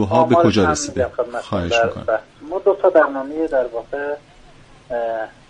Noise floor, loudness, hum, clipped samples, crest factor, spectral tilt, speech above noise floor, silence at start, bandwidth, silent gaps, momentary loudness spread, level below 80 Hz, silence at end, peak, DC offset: -45 dBFS; -19 LUFS; none; under 0.1%; 16 dB; -5 dB/octave; 27 dB; 0 s; 10 kHz; none; 12 LU; -46 dBFS; 0.2 s; -2 dBFS; under 0.1%